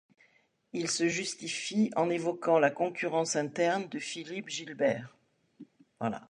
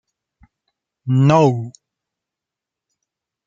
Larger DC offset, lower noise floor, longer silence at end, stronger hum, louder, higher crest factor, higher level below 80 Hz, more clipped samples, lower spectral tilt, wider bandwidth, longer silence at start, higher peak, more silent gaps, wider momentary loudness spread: neither; second, -69 dBFS vs -86 dBFS; second, 0.05 s vs 1.75 s; neither; second, -31 LUFS vs -16 LUFS; about the same, 20 dB vs 20 dB; second, -78 dBFS vs -60 dBFS; neither; second, -4 dB/octave vs -8 dB/octave; first, 11.5 kHz vs 7.6 kHz; second, 0.75 s vs 1.05 s; second, -12 dBFS vs -2 dBFS; neither; second, 11 LU vs 20 LU